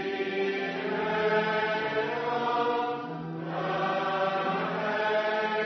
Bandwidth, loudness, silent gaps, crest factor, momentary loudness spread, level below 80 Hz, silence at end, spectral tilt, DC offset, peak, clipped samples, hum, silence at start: 6.4 kHz; -29 LUFS; none; 14 dB; 6 LU; -74 dBFS; 0 s; -6 dB/octave; under 0.1%; -14 dBFS; under 0.1%; none; 0 s